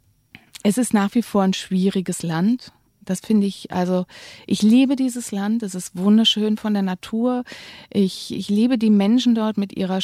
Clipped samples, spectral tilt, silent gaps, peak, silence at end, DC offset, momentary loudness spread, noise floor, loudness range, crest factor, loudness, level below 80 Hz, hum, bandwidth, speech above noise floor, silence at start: under 0.1%; -5.5 dB/octave; none; -6 dBFS; 0 s; under 0.1%; 11 LU; -50 dBFS; 3 LU; 14 dB; -20 LUFS; -62 dBFS; none; 14.5 kHz; 31 dB; 0.65 s